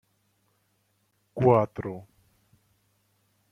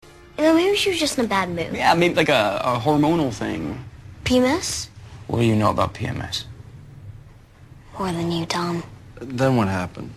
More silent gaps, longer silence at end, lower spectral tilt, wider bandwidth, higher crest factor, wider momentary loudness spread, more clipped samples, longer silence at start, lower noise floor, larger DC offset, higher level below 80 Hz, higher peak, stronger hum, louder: neither; first, 1.5 s vs 0 s; first, -10 dB/octave vs -5 dB/octave; second, 6.4 kHz vs 13.5 kHz; about the same, 24 dB vs 20 dB; about the same, 21 LU vs 21 LU; neither; first, 1.35 s vs 0.25 s; first, -72 dBFS vs -46 dBFS; neither; second, -62 dBFS vs -46 dBFS; second, -6 dBFS vs -2 dBFS; neither; second, -25 LUFS vs -21 LUFS